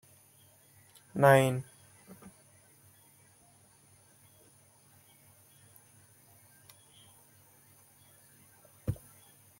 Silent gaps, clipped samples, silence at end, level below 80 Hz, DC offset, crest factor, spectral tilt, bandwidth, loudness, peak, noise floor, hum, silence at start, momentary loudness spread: none; under 0.1%; 0.65 s; -66 dBFS; under 0.1%; 28 dB; -6 dB/octave; 16.5 kHz; -28 LUFS; -8 dBFS; -63 dBFS; none; 1.15 s; 33 LU